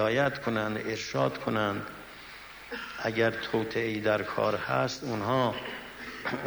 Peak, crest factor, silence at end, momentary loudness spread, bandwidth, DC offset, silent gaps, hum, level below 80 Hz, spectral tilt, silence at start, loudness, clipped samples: -12 dBFS; 18 dB; 0 s; 13 LU; over 20 kHz; under 0.1%; none; none; -60 dBFS; -5.5 dB/octave; 0 s; -30 LUFS; under 0.1%